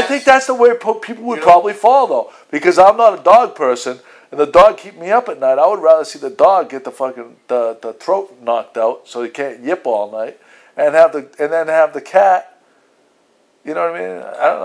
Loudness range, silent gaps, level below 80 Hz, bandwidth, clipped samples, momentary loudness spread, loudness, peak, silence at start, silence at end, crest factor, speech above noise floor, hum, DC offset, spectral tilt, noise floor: 8 LU; none; -52 dBFS; 11 kHz; 0.3%; 16 LU; -14 LUFS; 0 dBFS; 0 s; 0 s; 14 dB; 43 dB; none; under 0.1%; -4 dB/octave; -56 dBFS